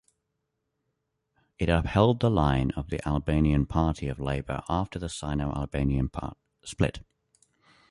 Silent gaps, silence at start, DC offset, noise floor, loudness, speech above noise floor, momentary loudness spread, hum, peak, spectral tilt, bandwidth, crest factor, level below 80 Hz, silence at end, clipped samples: none; 1.6 s; under 0.1%; -80 dBFS; -28 LUFS; 54 dB; 11 LU; none; -8 dBFS; -7 dB/octave; 11.5 kHz; 20 dB; -38 dBFS; 0.9 s; under 0.1%